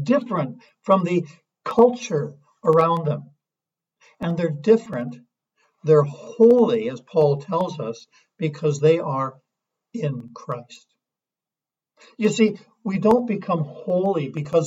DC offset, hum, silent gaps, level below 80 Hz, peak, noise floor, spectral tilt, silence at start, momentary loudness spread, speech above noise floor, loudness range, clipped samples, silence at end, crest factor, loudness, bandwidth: under 0.1%; none; none; -64 dBFS; -4 dBFS; under -90 dBFS; -7 dB/octave; 0 s; 15 LU; over 69 dB; 7 LU; under 0.1%; 0 s; 18 dB; -21 LUFS; 8 kHz